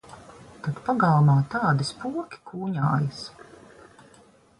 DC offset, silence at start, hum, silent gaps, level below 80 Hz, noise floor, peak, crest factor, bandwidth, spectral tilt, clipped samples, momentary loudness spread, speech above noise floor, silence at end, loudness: under 0.1%; 0.1 s; none; none; -60 dBFS; -55 dBFS; -10 dBFS; 16 dB; 11 kHz; -7 dB/octave; under 0.1%; 19 LU; 32 dB; 1.15 s; -24 LUFS